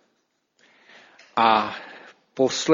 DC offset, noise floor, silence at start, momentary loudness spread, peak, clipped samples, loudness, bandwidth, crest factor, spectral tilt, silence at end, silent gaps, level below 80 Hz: under 0.1%; -72 dBFS; 1.35 s; 23 LU; -4 dBFS; under 0.1%; -22 LUFS; 7.6 kHz; 22 dB; -3.5 dB/octave; 0 s; none; -70 dBFS